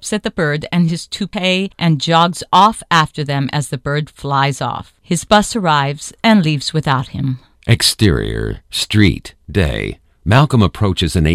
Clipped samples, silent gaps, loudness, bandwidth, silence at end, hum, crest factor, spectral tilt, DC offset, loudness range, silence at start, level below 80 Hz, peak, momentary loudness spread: under 0.1%; none; -15 LUFS; 15 kHz; 0 s; none; 16 dB; -5 dB/octave; under 0.1%; 2 LU; 0 s; -32 dBFS; 0 dBFS; 10 LU